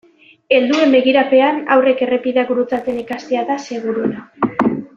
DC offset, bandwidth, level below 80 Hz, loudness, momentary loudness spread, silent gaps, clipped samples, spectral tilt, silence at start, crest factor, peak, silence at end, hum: under 0.1%; 7.4 kHz; -58 dBFS; -16 LUFS; 10 LU; none; under 0.1%; -5.5 dB/octave; 0.5 s; 16 dB; 0 dBFS; 0.1 s; none